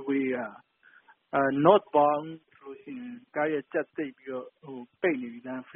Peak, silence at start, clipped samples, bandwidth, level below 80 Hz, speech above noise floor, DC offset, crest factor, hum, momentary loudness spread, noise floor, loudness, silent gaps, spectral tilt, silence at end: -6 dBFS; 0 s; under 0.1%; 3.8 kHz; -74 dBFS; 31 dB; under 0.1%; 24 dB; none; 22 LU; -59 dBFS; -28 LUFS; none; -4.5 dB/octave; 0.15 s